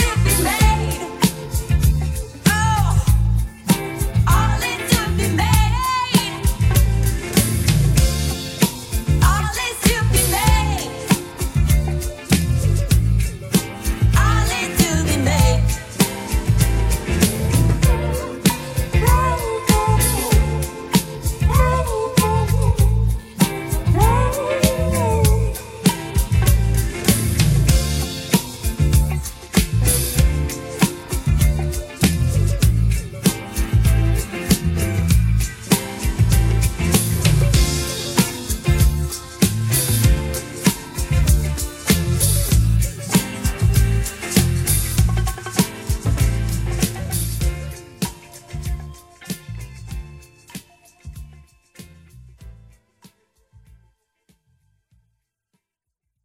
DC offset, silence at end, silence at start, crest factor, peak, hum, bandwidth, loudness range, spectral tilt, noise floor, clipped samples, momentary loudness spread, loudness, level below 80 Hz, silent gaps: under 0.1%; 3.7 s; 0 s; 18 dB; -2 dBFS; none; 16.5 kHz; 3 LU; -5 dB/octave; -80 dBFS; under 0.1%; 8 LU; -19 LUFS; -22 dBFS; none